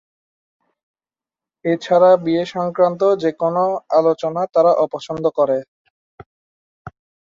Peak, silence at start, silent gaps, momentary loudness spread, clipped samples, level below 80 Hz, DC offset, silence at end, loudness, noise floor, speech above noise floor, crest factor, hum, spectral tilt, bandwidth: -2 dBFS; 1.65 s; 5.68-6.18 s, 6.26-6.85 s; 9 LU; under 0.1%; -62 dBFS; under 0.1%; 0.5 s; -17 LUFS; under -90 dBFS; over 74 dB; 16 dB; none; -7 dB/octave; 7.6 kHz